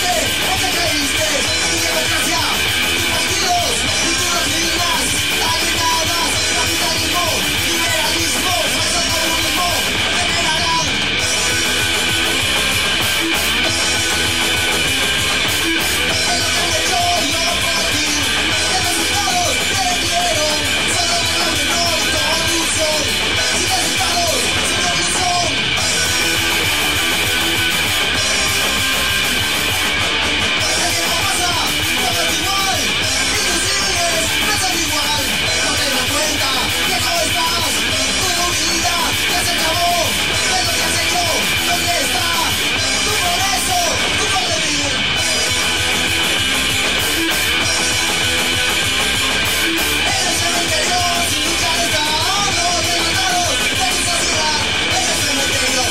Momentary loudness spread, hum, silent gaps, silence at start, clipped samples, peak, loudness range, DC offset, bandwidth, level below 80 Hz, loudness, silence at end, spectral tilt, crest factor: 1 LU; none; none; 0 s; under 0.1%; -4 dBFS; 0 LU; 2%; 16.5 kHz; -36 dBFS; -14 LUFS; 0 s; -1.5 dB/octave; 14 dB